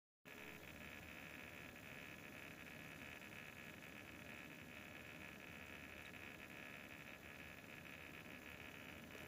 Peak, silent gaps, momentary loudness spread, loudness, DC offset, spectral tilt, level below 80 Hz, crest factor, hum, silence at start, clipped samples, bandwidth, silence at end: -38 dBFS; none; 1 LU; -55 LUFS; under 0.1%; -4 dB/octave; -76 dBFS; 18 dB; none; 0.25 s; under 0.1%; 15.5 kHz; 0 s